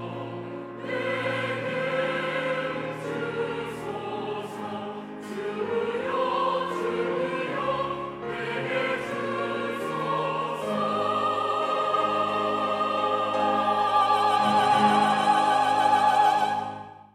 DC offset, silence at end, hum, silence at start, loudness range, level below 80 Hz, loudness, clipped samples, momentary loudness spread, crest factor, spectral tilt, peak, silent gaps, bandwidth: under 0.1%; 0.1 s; none; 0 s; 9 LU; -66 dBFS; -26 LUFS; under 0.1%; 12 LU; 18 dB; -5 dB/octave; -8 dBFS; none; 14.5 kHz